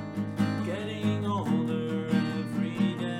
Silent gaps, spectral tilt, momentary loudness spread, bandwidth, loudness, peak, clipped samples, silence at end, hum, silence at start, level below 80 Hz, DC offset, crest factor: none; -7.5 dB/octave; 3 LU; 12.5 kHz; -29 LUFS; -14 dBFS; under 0.1%; 0 s; none; 0 s; -64 dBFS; under 0.1%; 14 dB